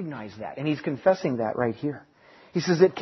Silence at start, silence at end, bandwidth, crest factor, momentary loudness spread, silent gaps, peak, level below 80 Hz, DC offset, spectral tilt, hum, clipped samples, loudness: 0 s; 0 s; 6.2 kHz; 20 dB; 15 LU; none; -6 dBFS; -66 dBFS; under 0.1%; -6 dB/octave; none; under 0.1%; -26 LUFS